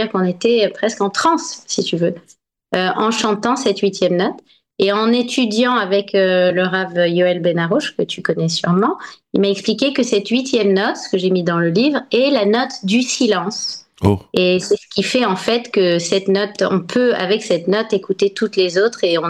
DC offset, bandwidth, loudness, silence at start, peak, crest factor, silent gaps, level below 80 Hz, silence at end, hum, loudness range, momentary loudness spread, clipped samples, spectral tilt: under 0.1%; 12 kHz; -17 LUFS; 0 s; 0 dBFS; 16 dB; none; -58 dBFS; 0 s; none; 2 LU; 5 LU; under 0.1%; -4.5 dB/octave